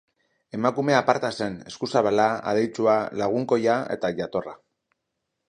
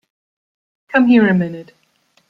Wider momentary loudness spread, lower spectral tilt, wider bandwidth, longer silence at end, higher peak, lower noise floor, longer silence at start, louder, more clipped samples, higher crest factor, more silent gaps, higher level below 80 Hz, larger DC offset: second, 10 LU vs 15 LU; second, -5.5 dB/octave vs -9 dB/octave; first, 11 kHz vs 5 kHz; first, 0.95 s vs 0.65 s; about the same, -2 dBFS vs -2 dBFS; first, -80 dBFS vs -60 dBFS; second, 0.55 s vs 0.95 s; second, -24 LUFS vs -14 LUFS; neither; first, 22 dB vs 16 dB; neither; about the same, -64 dBFS vs -60 dBFS; neither